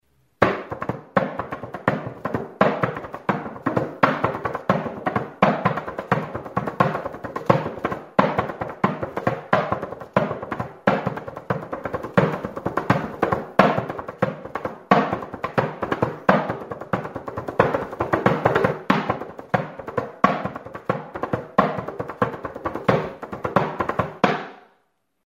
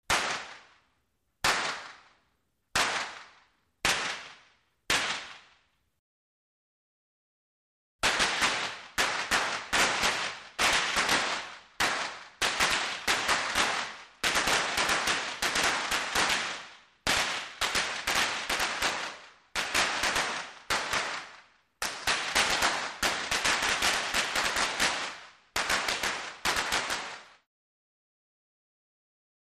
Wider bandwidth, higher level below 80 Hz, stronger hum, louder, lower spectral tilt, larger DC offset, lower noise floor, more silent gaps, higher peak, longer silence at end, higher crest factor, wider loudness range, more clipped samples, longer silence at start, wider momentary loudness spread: about the same, 15.5 kHz vs 15.5 kHz; about the same, -52 dBFS vs -56 dBFS; neither; first, -24 LUFS vs -28 LUFS; first, -7.5 dB/octave vs -0.5 dB/octave; neither; second, -69 dBFS vs -76 dBFS; second, none vs 5.99-7.99 s; first, 0 dBFS vs -12 dBFS; second, 0.65 s vs 2.15 s; first, 24 dB vs 18 dB; second, 2 LU vs 6 LU; neither; first, 0.4 s vs 0.1 s; about the same, 10 LU vs 11 LU